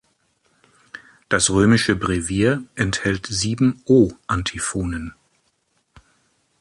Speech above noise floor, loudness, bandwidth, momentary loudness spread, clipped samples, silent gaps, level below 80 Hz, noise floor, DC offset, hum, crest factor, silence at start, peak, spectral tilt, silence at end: 48 dB; -20 LUFS; 11.5 kHz; 19 LU; under 0.1%; none; -40 dBFS; -67 dBFS; under 0.1%; none; 18 dB; 0.95 s; -2 dBFS; -4.5 dB/octave; 1.5 s